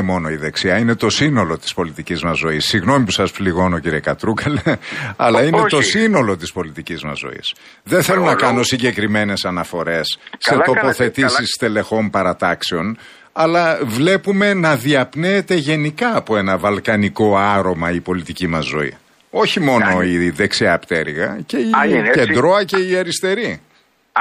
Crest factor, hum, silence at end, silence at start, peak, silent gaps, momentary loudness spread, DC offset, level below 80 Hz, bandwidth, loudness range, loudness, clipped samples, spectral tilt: 16 dB; none; 0 s; 0 s; -2 dBFS; none; 9 LU; under 0.1%; -46 dBFS; 15.5 kHz; 2 LU; -16 LUFS; under 0.1%; -5 dB/octave